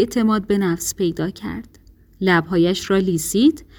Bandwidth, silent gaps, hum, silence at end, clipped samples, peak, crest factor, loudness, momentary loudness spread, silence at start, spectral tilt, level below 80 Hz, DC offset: over 20 kHz; none; none; 0.15 s; under 0.1%; -4 dBFS; 16 dB; -19 LUFS; 9 LU; 0 s; -5 dB/octave; -46 dBFS; under 0.1%